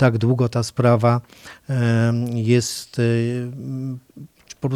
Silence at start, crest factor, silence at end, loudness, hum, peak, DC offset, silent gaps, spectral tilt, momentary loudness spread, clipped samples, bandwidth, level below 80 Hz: 0 s; 18 dB; 0 s; -20 LUFS; none; -2 dBFS; under 0.1%; none; -6.5 dB/octave; 12 LU; under 0.1%; 14 kHz; -58 dBFS